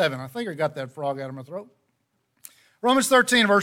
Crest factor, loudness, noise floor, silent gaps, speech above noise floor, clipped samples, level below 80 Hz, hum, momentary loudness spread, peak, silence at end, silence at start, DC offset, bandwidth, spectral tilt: 18 dB; -23 LUFS; -73 dBFS; none; 50 dB; under 0.1%; -70 dBFS; none; 18 LU; -6 dBFS; 0 s; 0 s; under 0.1%; 17.5 kHz; -3.5 dB/octave